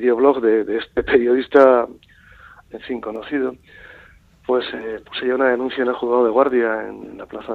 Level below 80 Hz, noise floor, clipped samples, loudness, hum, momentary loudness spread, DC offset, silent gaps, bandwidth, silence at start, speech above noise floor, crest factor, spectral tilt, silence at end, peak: -52 dBFS; -49 dBFS; under 0.1%; -18 LUFS; none; 19 LU; under 0.1%; none; 4.7 kHz; 0 s; 30 dB; 18 dB; -6.5 dB/octave; 0 s; 0 dBFS